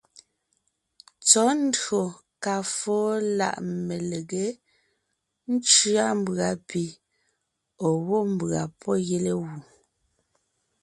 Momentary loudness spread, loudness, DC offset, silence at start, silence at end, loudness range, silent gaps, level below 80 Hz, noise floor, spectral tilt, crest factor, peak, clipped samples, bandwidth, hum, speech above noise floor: 14 LU; -24 LUFS; under 0.1%; 0.15 s; 1.2 s; 5 LU; none; -66 dBFS; -78 dBFS; -3.5 dB/octave; 24 dB; -2 dBFS; under 0.1%; 11.5 kHz; none; 53 dB